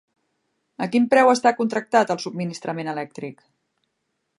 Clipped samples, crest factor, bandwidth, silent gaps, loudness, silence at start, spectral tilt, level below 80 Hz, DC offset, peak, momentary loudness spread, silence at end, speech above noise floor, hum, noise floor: under 0.1%; 20 dB; 11.5 kHz; none; -21 LUFS; 0.8 s; -5 dB/octave; -76 dBFS; under 0.1%; -2 dBFS; 16 LU; 1.05 s; 55 dB; none; -76 dBFS